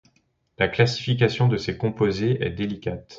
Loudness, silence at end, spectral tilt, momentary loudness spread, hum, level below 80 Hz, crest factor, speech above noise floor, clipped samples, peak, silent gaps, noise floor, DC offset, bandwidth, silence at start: -23 LUFS; 0 s; -6.5 dB/octave; 8 LU; none; -48 dBFS; 18 dB; 44 dB; under 0.1%; -6 dBFS; none; -66 dBFS; under 0.1%; 7.6 kHz; 0.6 s